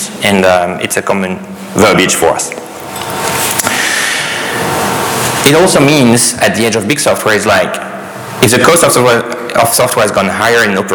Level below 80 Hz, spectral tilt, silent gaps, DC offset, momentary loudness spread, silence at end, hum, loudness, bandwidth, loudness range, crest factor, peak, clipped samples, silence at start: -44 dBFS; -3.5 dB/octave; none; under 0.1%; 12 LU; 0 s; none; -10 LUFS; over 20 kHz; 3 LU; 10 dB; 0 dBFS; 0.2%; 0 s